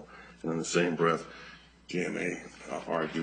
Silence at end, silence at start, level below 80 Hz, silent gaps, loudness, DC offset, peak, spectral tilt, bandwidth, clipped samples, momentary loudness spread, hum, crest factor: 0 s; 0 s; -64 dBFS; none; -32 LUFS; under 0.1%; -12 dBFS; -4.5 dB/octave; 9.4 kHz; under 0.1%; 20 LU; none; 20 dB